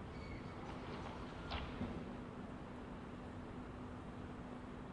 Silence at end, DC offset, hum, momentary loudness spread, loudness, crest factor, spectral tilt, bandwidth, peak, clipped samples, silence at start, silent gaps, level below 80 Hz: 0 s; under 0.1%; none; 5 LU; -49 LUFS; 18 dB; -7 dB/octave; 11 kHz; -30 dBFS; under 0.1%; 0 s; none; -58 dBFS